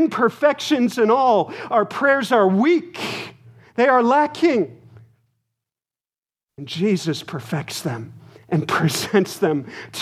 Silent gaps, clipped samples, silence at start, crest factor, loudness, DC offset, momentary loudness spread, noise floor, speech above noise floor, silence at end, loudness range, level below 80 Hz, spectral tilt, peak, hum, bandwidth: 6.18-6.23 s, 6.43-6.47 s; under 0.1%; 0 s; 18 dB; -19 LUFS; under 0.1%; 13 LU; under -90 dBFS; over 71 dB; 0 s; 9 LU; -68 dBFS; -5.5 dB/octave; -2 dBFS; none; 15.5 kHz